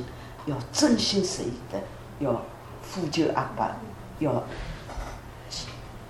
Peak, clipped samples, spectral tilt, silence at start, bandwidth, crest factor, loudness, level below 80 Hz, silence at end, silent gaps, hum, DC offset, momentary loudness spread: -10 dBFS; under 0.1%; -4.5 dB/octave; 0 s; 15.5 kHz; 20 dB; -29 LUFS; -46 dBFS; 0 s; none; none; under 0.1%; 17 LU